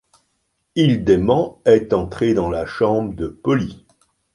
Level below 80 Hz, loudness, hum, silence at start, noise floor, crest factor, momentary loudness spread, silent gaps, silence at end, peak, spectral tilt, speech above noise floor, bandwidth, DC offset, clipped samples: -42 dBFS; -18 LUFS; none; 0.75 s; -70 dBFS; 16 dB; 9 LU; none; 0.6 s; -2 dBFS; -7.5 dB/octave; 52 dB; 11.5 kHz; under 0.1%; under 0.1%